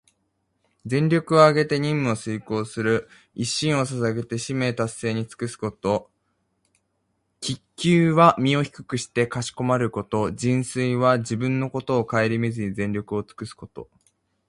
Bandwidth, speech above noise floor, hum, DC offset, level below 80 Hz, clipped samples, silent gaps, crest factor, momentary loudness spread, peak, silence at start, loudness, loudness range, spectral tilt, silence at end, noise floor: 11.5 kHz; 50 dB; none; under 0.1%; -56 dBFS; under 0.1%; none; 22 dB; 14 LU; -2 dBFS; 0.85 s; -23 LUFS; 6 LU; -6 dB/octave; 0.65 s; -73 dBFS